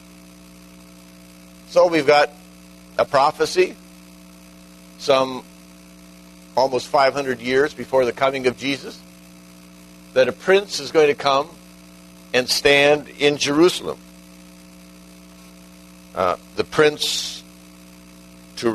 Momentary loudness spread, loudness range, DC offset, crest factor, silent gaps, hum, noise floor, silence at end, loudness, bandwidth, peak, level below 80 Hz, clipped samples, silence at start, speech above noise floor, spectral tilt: 13 LU; 6 LU; under 0.1%; 20 dB; none; 60 Hz at -45 dBFS; -44 dBFS; 0 s; -19 LUFS; 13.5 kHz; -2 dBFS; -54 dBFS; under 0.1%; 1.7 s; 26 dB; -3.5 dB/octave